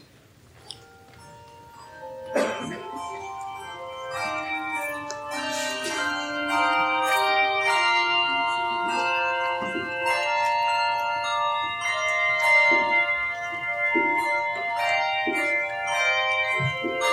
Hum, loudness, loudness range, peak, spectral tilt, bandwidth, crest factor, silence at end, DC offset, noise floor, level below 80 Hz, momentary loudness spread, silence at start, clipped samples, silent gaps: none; -23 LUFS; 10 LU; -8 dBFS; -2.5 dB/octave; 16 kHz; 16 dB; 0 s; under 0.1%; -54 dBFS; -66 dBFS; 14 LU; 0.65 s; under 0.1%; none